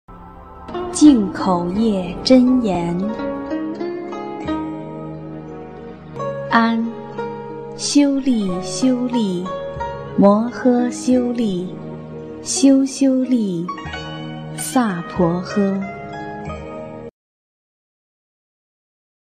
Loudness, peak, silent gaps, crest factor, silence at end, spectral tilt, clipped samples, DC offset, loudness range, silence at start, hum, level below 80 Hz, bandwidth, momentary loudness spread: -19 LUFS; 0 dBFS; none; 18 dB; 2.1 s; -5.5 dB/octave; under 0.1%; under 0.1%; 9 LU; 0.1 s; none; -46 dBFS; 13 kHz; 18 LU